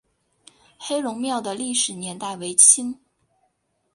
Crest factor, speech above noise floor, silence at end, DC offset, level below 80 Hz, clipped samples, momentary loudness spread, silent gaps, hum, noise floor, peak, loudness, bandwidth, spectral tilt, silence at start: 24 dB; 49 dB; 1 s; under 0.1%; -70 dBFS; under 0.1%; 19 LU; none; none; -71 dBFS; 0 dBFS; -19 LUFS; 11.5 kHz; -1.5 dB/octave; 0.8 s